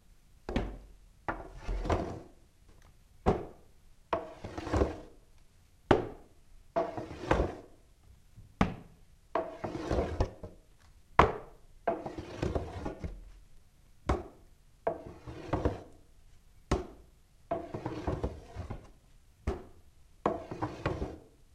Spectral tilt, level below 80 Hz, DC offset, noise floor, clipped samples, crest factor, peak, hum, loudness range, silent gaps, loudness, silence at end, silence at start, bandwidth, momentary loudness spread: -7 dB/octave; -44 dBFS; under 0.1%; -60 dBFS; under 0.1%; 32 dB; -6 dBFS; none; 6 LU; none; -36 LUFS; 0.25 s; 0.1 s; 13 kHz; 17 LU